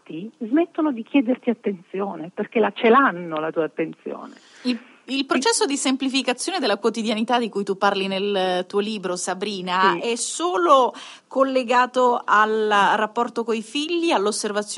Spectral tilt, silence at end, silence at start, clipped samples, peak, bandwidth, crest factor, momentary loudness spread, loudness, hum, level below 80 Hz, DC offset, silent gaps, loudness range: -3.5 dB/octave; 0 s; 0.1 s; under 0.1%; -2 dBFS; 11.5 kHz; 18 dB; 11 LU; -21 LUFS; none; under -90 dBFS; under 0.1%; none; 4 LU